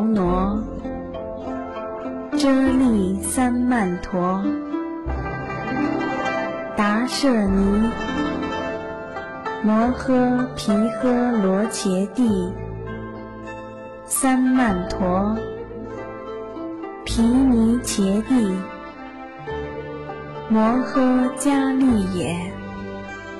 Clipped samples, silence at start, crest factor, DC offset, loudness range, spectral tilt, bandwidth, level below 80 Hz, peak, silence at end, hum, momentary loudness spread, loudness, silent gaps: under 0.1%; 0 s; 12 dB; 0.1%; 2 LU; -5.5 dB/octave; 12.5 kHz; -38 dBFS; -8 dBFS; 0 s; none; 14 LU; -21 LUFS; none